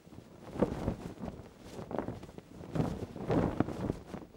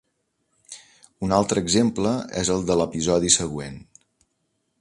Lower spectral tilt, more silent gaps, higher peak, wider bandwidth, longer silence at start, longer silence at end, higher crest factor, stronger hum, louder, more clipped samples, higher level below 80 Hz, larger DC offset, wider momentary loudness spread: first, -8 dB/octave vs -4 dB/octave; neither; second, -12 dBFS vs -4 dBFS; first, 16.5 kHz vs 11.5 kHz; second, 0.05 s vs 0.7 s; second, 0 s vs 0.95 s; about the same, 24 dB vs 22 dB; neither; second, -37 LUFS vs -22 LUFS; neither; about the same, -52 dBFS vs -48 dBFS; neither; second, 17 LU vs 23 LU